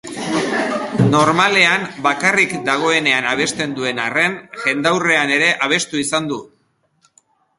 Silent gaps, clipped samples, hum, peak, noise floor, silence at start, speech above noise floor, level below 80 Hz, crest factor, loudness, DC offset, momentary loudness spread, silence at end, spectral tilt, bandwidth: none; under 0.1%; none; 0 dBFS; -62 dBFS; 0.05 s; 46 dB; -56 dBFS; 18 dB; -16 LUFS; under 0.1%; 8 LU; 1.15 s; -3.5 dB/octave; 11.5 kHz